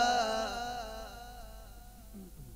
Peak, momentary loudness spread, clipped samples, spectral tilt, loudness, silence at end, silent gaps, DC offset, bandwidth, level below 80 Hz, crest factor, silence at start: -18 dBFS; 21 LU; under 0.1%; -2.5 dB/octave; -35 LUFS; 0 s; none; under 0.1%; 16 kHz; -52 dBFS; 18 dB; 0 s